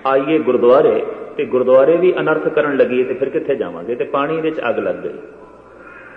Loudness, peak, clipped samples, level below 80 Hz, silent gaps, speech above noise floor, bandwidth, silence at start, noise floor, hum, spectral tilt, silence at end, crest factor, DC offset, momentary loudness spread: -16 LUFS; 0 dBFS; under 0.1%; -60 dBFS; none; 24 dB; 4.3 kHz; 0 s; -39 dBFS; none; -8.5 dB/octave; 0 s; 16 dB; under 0.1%; 12 LU